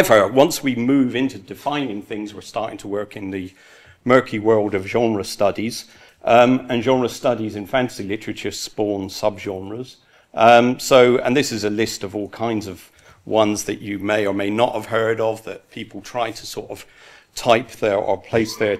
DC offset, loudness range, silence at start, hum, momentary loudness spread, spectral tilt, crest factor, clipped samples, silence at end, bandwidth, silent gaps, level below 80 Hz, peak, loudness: under 0.1%; 6 LU; 0 s; none; 17 LU; -4.5 dB/octave; 20 dB; under 0.1%; 0 s; 15.5 kHz; none; -56 dBFS; 0 dBFS; -19 LUFS